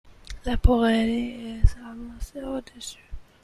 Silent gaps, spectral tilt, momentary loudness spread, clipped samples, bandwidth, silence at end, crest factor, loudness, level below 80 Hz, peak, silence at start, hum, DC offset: none; -6.5 dB/octave; 19 LU; under 0.1%; 13 kHz; 0.2 s; 22 dB; -25 LUFS; -30 dBFS; -4 dBFS; 0.3 s; none; under 0.1%